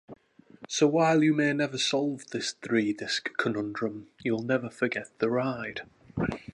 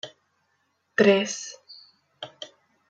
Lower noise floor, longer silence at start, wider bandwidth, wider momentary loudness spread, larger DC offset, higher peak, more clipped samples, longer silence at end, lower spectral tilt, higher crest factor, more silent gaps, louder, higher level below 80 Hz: second, -52 dBFS vs -72 dBFS; about the same, 0.1 s vs 0.05 s; first, 11 kHz vs 9 kHz; second, 11 LU vs 23 LU; neither; second, -12 dBFS vs -6 dBFS; neither; second, 0.1 s vs 0.45 s; about the same, -4.5 dB/octave vs -4 dB/octave; about the same, 18 dB vs 22 dB; neither; second, -28 LUFS vs -23 LUFS; first, -60 dBFS vs -78 dBFS